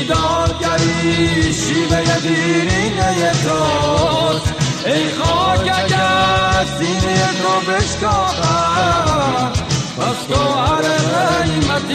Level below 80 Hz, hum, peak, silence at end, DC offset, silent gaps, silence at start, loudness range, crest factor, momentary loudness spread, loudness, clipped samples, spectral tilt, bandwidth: -32 dBFS; none; -2 dBFS; 0 s; under 0.1%; none; 0 s; 1 LU; 12 dB; 3 LU; -15 LUFS; under 0.1%; -4.5 dB/octave; 13.5 kHz